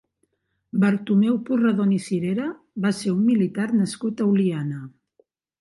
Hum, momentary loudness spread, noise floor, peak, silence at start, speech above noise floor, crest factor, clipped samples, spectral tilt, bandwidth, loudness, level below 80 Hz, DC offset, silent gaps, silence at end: none; 9 LU; -72 dBFS; -8 dBFS; 0.75 s; 50 dB; 14 dB; under 0.1%; -7 dB/octave; 11.5 kHz; -22 LUFS; -68 dBFS; under 0.1%; none; 0.7 s